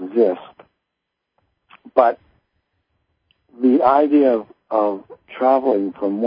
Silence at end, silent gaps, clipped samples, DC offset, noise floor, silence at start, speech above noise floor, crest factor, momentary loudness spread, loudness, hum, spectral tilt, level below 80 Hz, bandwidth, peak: 0 s; none; under 0.1%; under 0.1%; -79 dBFS; 0 s; 62 dB; 20 dB; 13 LU; -18 LUFS; none; -11 dB/octave; -66 dBFS; 5.2 kHz; 0 dBFS